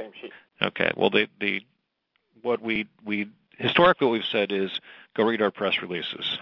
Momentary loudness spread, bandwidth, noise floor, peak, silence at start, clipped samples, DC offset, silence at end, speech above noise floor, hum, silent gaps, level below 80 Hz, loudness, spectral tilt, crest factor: 15 LU; 6 kHz; -75 dBFS; -4 dBFS; 0 s; under 0.1%; under 0.1%; 0 s; 49 dB; none; none; -64 dBFS; -25 LUFS; -7 dB/octave; 22 dB